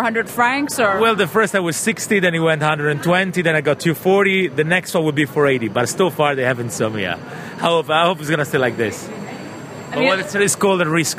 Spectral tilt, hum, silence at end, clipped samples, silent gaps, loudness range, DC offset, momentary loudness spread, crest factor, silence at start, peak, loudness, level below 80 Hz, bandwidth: -4.5 dB/octave; none; 0 s; under 0.1%; none; 3 LU; under 0.1%; 8 LU; 16 dB; 0 s; -2 dBFS; -17 LUFS; -58 dBFS; 16 kHz